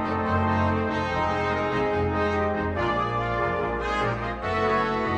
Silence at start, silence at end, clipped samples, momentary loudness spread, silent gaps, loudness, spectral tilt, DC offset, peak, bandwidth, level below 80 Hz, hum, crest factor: 0 s; 0 s; under 0.1%; 3 LU; none; -25 LUFS; -7 dB/octave; under 0.1%; -10 dBFS; 9.2 kHz; -42 dBFS; none; 14 dB